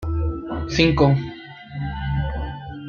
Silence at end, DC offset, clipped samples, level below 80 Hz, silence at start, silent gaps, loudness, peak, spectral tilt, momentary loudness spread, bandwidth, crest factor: 0 s; under 0.1%; under 0.1%; -32 dBFS; 0 s; none; -22 LUFS; -2 dBFS; -6.5 dB/octave; 17 LU; 7.2 kHz; 20 dB